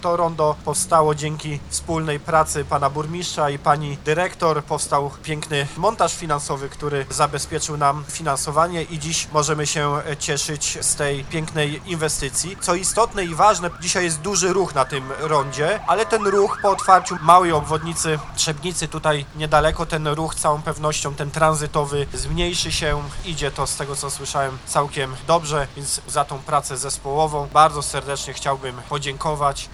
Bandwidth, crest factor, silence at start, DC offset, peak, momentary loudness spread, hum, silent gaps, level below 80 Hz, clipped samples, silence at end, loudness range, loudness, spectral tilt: 14 kHz; 20 dB; 0 s; under 0.1%; 0 dBFS; 8 LU; none; none; -38 dBFS; under 0.1%; 0 s; 5 LU; -21 LUFS; -3.5 dB/octave